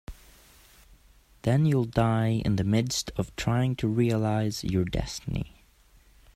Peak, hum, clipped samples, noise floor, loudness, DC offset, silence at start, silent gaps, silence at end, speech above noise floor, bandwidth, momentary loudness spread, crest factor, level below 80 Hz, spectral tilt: -8 dBFS; none; under 0.1%; -58 dBFS; -27 LUFS; under 0.1%; 0.1 s; none; 0.85 s; 33 dB; 14.5 kHz; 9 LU; 20 dB; -44 dBFS; -6 dB/octave